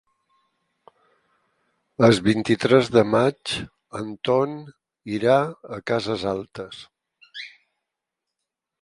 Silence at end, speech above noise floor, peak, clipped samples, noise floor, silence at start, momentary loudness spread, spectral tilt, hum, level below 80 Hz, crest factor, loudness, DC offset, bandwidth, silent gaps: 1.35 s; 63 dB; -2 dBFS; under 0.1%; -84 dBFS; 2 s; 21 LU; -6 dB/octave; none; -58 dBFS; 22 dB; -22 LUFS; under 0.1%; 11.5 kHz; none